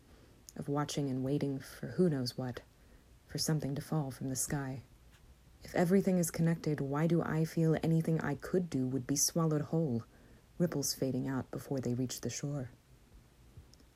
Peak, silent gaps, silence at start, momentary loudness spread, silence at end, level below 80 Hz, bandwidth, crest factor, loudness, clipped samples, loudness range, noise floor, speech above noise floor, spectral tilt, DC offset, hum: -18 dBFS; none; 0.1 s; 12 LU; 0.35 s; -62 dBFS; 15.5 kHz; 18 dB; -34 LUFS; under 0.1%; 5 LU; -61 dBFS; 27 dB; -5.5 dB/octave; under 0.1%; none